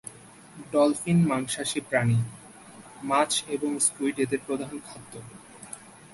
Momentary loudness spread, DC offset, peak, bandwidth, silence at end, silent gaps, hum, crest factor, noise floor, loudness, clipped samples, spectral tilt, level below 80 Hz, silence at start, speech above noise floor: 22 LU; under 0.1%; -8 dBFS; 12 kHz; 0.25 s; none; none; 20 dB; -48 dBFS; -26 LUFS; under 0.1%; -4.5 dB/octave; -62 dBFS; 0.05 s; 22 dB